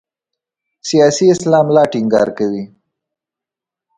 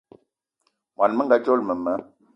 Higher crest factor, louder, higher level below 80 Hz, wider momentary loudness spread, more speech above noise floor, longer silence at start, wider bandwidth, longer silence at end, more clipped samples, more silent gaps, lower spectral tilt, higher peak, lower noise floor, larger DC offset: about the same, 16 dB vs 20 dB; first, -13 LUFS vs -22 LUFS; first, -58 dBFS vs -68 dBFS; first, 14 LU vs 9 LU; first, 74 dB vs 52 dB; second, 0.85 s vs 1 s; first, 9.6 kHz vs 6 kHz; first, 1.3 s vs 0.35 s; neither; neither; second, -5.5 dB/octave vs -7.5 dB/octave; first, 0 dBFS vs -4 dBFS; first, -86 dBFS vs -73 dBFS; neither